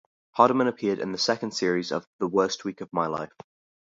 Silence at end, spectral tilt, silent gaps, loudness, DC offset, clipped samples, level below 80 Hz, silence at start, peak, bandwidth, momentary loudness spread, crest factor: 0.6 s; -4.5 dB/octave; 2.07-2.19 s; -26 LUFS; under 0.1%; under 0.1%; -68 dBFS; 0.35 s; -2 dBFS; 7.8 kHz; 11 LU; 24 dB